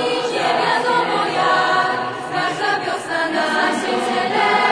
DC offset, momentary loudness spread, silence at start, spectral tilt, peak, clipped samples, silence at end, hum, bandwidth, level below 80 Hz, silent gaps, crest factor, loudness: under 0.1%; 6 LU; 0 s; -3.5 dB/octave; -4 dBFS; under 0.1%; 0 s; none; 11 kHz; -62 dBFS; none; 16 dB; -18 LUFS